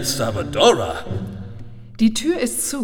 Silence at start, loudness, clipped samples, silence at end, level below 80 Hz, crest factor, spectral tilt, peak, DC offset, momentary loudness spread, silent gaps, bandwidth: 0 s; -19 LUFS; under 0.1%; 0 s; -44 dBFS; 20 dB; -4 dB/octave; 0 dBFS; under 0.1%; 21 LU; none; 19.5 kHz